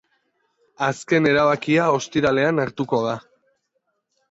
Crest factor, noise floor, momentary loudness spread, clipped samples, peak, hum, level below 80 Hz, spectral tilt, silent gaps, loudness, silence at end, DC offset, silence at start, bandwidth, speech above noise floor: 16 dB; -73 dBFS; 8 LU; under 0.1%; -6 dBFS; none; -58 dBFS; -5.5 dB/octave; none; -20 LUFS; 1.1 s; under 0.1%; 0.8 s; 8 kHz; 53 dB